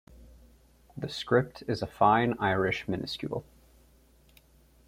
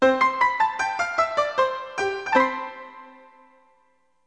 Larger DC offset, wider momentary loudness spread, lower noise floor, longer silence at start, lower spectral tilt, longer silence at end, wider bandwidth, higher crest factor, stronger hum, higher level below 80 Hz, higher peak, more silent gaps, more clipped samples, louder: neither; about the same, 14 LU vs 14 LU; second, -61 dBFS vs -66 dBFS; about the same, 0.1 s vs 0 s; first, -6.5 dB/octave vs -3 dB/octave; first, 1.45 s vs 1.15 s; first, 16 kHz vs 9.8 kHz; about the same, 22 dB vs 20 dB; neither; about the same, -58 dBFS vs -62 dBFS; second, -8 dBFS vs -4 dBFS; neither; neither; second, -29 LUFS vs -23 LUFS